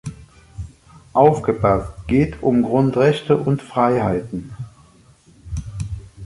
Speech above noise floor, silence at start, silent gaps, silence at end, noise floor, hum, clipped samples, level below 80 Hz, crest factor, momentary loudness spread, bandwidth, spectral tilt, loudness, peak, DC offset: 33 dB; 0.05 s; none; 0 s; -50 dBFS; none; under 0.1%; -38 dBFS; 18 dB; 20 LU; 11.5 kHz; -8 dB/octave; -18 LUFS; -2 dBFS; under 0.1%